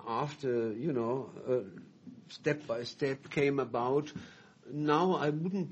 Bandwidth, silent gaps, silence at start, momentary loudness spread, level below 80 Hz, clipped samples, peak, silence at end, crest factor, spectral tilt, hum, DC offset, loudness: 8.2 kHz; none; 0 s; 19 LU; -72 dBFS; under 0.1%; -14 dBFS; 0 s; 18 dB; -7 dB/octave; none; under 0.1%; -33 LUFS